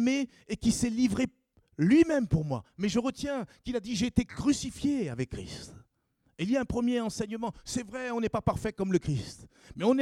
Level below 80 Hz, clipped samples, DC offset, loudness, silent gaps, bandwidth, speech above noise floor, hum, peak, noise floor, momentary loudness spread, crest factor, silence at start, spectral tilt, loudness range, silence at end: -50 dBFS; under 0.1%; under 0.1%; -30 LUFS; none; 13.5 kHz; 44 dB; none; -10 dBFS; -73 dBFS; 10 LU; 20 dB; 0 s; -5.5 dB/octave; 5 LU; 0 s